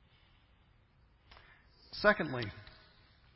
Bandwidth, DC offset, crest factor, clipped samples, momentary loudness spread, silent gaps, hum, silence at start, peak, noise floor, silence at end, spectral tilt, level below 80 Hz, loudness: 5.6 kHz; under 0.1%; 28 dB; under 0.1%; 24 LU; none; none; 1.9 s; -12 dBFS; -67 dBFS; 0.7 s; -3 dB/octave; -62 dBFS; -33 LUFS